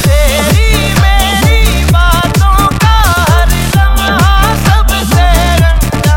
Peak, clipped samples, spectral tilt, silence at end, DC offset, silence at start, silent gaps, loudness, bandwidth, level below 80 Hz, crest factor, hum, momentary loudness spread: 0 dBFS; 0.7%; -4.5 dB/octave; 0 s; under 0.1%; 0 s; none; -9 LUFS; 17.5 kHz; -10 dBFS; 8 dB; none; 1 LU